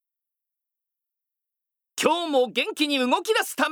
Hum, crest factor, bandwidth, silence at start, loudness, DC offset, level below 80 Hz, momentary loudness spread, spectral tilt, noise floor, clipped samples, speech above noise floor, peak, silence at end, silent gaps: none; 22 dB; over 20 kHz; 1.95 s; -23 LUFS; under 0.1%; -88 dBFS; 3 LU; -2 dB/octave; -84 dBFS; under 0.1%; 61 dB; -4 dBFS; 0 s; none